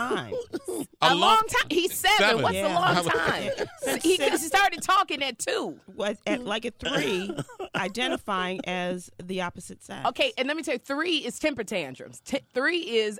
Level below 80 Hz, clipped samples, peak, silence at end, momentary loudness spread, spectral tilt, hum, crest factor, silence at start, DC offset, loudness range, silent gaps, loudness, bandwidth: -56 dBFS; under 0.1%; -4 dBFS; 0 s; 13 LU; -3 dB/octave; none; 22 dB; 0 s; under 0.1%; 7 LU; none; -26 LUFS; 18.5 kHz